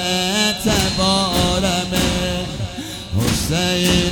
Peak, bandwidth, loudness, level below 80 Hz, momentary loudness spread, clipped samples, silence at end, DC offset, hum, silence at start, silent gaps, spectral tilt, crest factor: -2 dBFS; over 20 kHz; -18 LUFS; -32 dBFS; 9 LU; under 0.1%; 0 s; under 0.1%; none; 0 s; none; -4 dB/octave; 16 dB